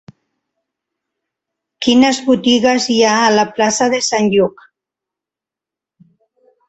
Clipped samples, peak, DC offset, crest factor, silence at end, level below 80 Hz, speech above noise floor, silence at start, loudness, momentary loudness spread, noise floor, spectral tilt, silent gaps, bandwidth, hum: under 0.1%; 0 dBFS; under 0.1%; 16 dB; 2.2 s; -56 dBFS; 74 dB; 1.8 s; -13 LUFS; 4 LU; -87 dBFS; -3.5 dB/octave; none; 8.2 kHz; none